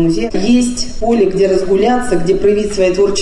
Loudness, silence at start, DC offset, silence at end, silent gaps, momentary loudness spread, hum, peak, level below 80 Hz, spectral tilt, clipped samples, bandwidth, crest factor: -13 LUFS; 0 s; under 0.1%; 0 s; none; 3 LU; none; -2 dBFS; -28 dBFS; -5 dB/octave; under 0.1%; 11 kHz; 10 dB